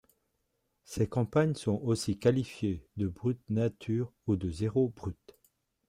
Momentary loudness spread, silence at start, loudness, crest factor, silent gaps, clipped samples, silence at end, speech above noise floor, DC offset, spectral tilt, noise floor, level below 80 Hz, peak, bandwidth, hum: 8 LU; 0.9 s; -32 LUFS; 20 dB; none; under 0.1%; 0.75 s; 48 dB; under 0.1%; -7 dB/octave; -79 dBFS; -58 dBFS; -12 dBFS; 15.5 kHz; none